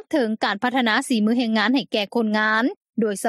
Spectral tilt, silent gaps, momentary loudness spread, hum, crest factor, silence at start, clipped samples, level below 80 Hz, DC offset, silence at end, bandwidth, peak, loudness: -4.5 dB/octave; 2.76-2.81 s, 2.89-2.93 s; 5 LU; none; 16 dB; 0.1 s; under 0.1%; -76 dBFS; under 0.1%; 0 s; 13.5 kHz; -4 dBFS; -21 LUFS